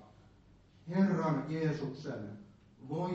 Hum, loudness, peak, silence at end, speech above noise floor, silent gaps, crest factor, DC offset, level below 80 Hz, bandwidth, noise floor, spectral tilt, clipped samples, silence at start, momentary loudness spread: none; -35 LUFS; -18 dBFS; 0 s; 25 dB; none; 18 dB; under 0.1%; -68 dBFS; 7.6 kHz; -62 dBFS; -7.5 dB/octave; under 0.1%; 0 s; 23 LU